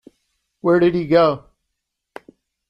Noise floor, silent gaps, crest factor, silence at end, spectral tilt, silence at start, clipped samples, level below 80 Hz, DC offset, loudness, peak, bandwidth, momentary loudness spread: -78 dBFS; none; 18 dB; 1.3 s; -8.5 dB/octave; 0.65 s; under 0.1%; -54 dBFS; under 0.1%; -17 LUFS; -2 dBFS; 5.8 kHz; 9 LU